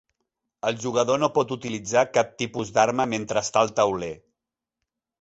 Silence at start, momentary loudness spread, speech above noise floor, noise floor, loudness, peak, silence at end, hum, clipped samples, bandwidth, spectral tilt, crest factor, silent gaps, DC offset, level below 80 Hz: 0.65 s; 9 LU; 63 dB; -87 dBFS; -24 LUFS; -6 dBFS; 1.05 s; none; under 0.1%; 8.2 kHz; -4 dB/octave; 20 dB; none; under 0.1%; -60 dBFS